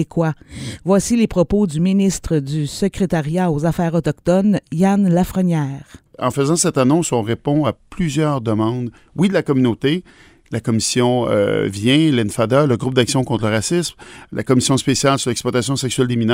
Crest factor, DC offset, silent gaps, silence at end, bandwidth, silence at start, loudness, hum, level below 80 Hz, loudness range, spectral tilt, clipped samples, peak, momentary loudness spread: 16 dB; under 0.1%; none; 0 s; 16 kHz; 0 s; -17 LUFS; none; -42 dBFS; 2 LU; -5.5 dB/octave; under 0.1%; 0 dBFS; 8 LU